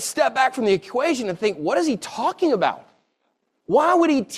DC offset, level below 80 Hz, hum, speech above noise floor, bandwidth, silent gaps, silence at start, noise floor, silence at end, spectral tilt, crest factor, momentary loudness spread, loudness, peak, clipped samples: under 0.1%; -66 dBFS; none; 51 dB; 15 kHz; none; 0 s; -72 dBFS; 0 s; -4 dB/octave; 16 dB; 7 LU; -21 LUFS; -6 dBFS; under 0.1%